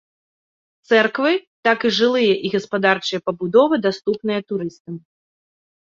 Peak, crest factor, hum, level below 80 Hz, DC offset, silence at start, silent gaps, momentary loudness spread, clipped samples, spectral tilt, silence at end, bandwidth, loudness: -2 dBFS; 18 dB; none; -64 dBFS; under 0.1%; 0.9 s; 1.47-1.63 s, 4.80-4.85 s; 11 LU; under 0.1%; -5 dB/octave; 0.95 s; 7.6 kHz; -19 LUFS